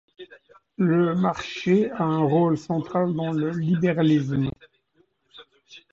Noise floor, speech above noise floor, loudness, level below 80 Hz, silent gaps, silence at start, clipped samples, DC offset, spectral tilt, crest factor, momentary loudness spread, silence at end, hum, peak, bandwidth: -66 dBFS; 44 dB; -23 LUFS; -58 dBFS; none; 0.2 s; under 0.1%; under 0.1%; -8 dB/octave; 16 dB; 6 LU; 0.15 s; none; -8 dBFS; 7.6 kHz